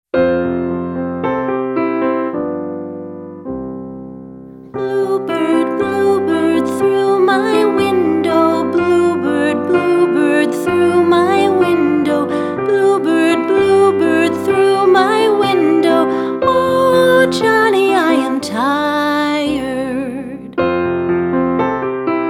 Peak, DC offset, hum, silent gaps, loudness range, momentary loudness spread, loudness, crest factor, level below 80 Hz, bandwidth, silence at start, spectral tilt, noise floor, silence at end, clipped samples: 0 dBFS; under 0.1%; none; none; 8 LU; 12 LU; -14 LUFS; 14 dB; -50 dBFS; 14 kHz; 0.15 s; -5.5 dB/octave; -34 dBFS; 0 s; under 0.1%